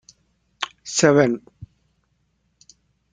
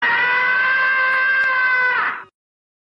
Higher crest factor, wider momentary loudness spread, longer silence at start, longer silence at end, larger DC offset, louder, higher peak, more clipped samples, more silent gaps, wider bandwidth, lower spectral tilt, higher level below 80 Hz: first, 22 dB vs 10 dB; first, 15 LU vs 5 LU; first, 0.6 s vs 0 s; first, 1.5 s vs 0.6 s; neither; second, -20 LUFS vs -16 LUFS; first, -2 dBFS vs -10 dBFS; neither; neither; first, 9.6 kHz vs 6 kHz; first, -4.5 dB/octave vs -3 dB/octave; first, -60 dBFS vs -68 dBFS